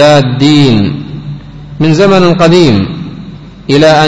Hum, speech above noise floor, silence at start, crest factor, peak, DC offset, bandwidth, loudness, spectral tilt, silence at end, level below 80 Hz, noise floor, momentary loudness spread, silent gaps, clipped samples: none; 21 dB; 0 s; 8 dB; 0 dBFS; under 0.1%; 11 kHz; -7 LUFS; -6.5 dB/octave; 0 s; -34 dBFS; -26 dBFS; 20 LU; none; 3%